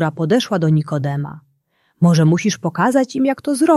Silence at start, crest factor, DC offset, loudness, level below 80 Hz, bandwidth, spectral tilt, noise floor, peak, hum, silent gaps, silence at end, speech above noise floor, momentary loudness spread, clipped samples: 0 s; 14 dB; under 0.1%; -17 LUFS; -58 dBFS; 12.5 kHz; -6.5 dB/octave; -64 dBFS; -2 dBFS; none; none; 0 s; 48 dB; 8 LU; under 0.1%